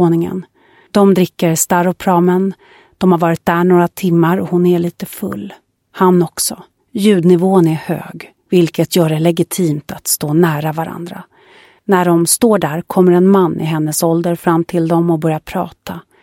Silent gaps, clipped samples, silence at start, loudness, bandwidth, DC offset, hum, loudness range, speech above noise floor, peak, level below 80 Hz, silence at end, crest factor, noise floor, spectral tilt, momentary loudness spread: none; under 0.1%; 0 s; -14 LUFS; 17 kHz; under 0.1%; none; 2 LU; 32 dB; 0 dBFS; -52 dBFS; 0.25 s; 14 dB; -45 dBFS; -6 dB/octave; 13 LU